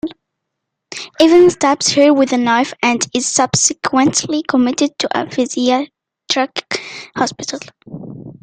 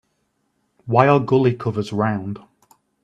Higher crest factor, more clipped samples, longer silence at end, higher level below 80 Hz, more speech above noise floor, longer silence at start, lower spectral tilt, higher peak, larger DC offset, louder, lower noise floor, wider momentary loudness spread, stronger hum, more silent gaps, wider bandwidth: about the same, 16 dB vs 20 dB; neither; second, 0.1 s vs 0.65 s; about the same, -56 dBFS vs -58 dBFS; first, 62 dB vs 51 dB; second, 0.05 s vs 0.85 s; second, -3 dB/octave vs -8.5 dB/octave; about the same, 0 dBFS vs 0 dBFS; neither; first, -14 LUFS vs -19 LUFS; first, -77 dBFS vs -69 dBFS; about the same, 18 LU vs 18 LU; neither; neither; about the same, 9.8 kHz vs 9.6 kHz